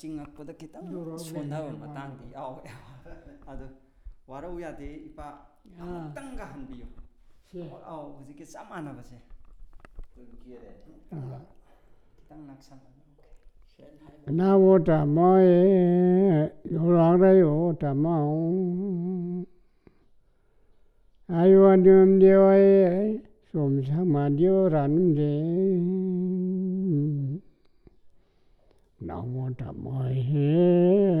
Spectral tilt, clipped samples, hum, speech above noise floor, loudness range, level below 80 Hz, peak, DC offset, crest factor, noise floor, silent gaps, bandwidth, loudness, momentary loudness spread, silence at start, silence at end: -10 dB/octave; under 0.1%; none; 38 dB; 24 LU; -52 dBFS; -8 dBFS; under 0.1%; 16 dB; -61 dBFS; none; 5.2 kHz; -22 LUFS; 25 LU; 0.05 s; 0 s